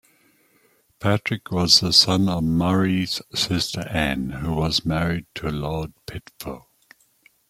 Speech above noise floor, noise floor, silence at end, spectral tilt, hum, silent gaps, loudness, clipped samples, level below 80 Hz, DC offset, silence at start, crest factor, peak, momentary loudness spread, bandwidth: 39 dB; -61 dBFS; 0.9 s; -4 dB/octave; none; none; -21 LUFS; under 0.1%; -44 dBFS; under 0.1%; 1 s; 22 dB; -2 dBFS; 20 LU; 16 kHz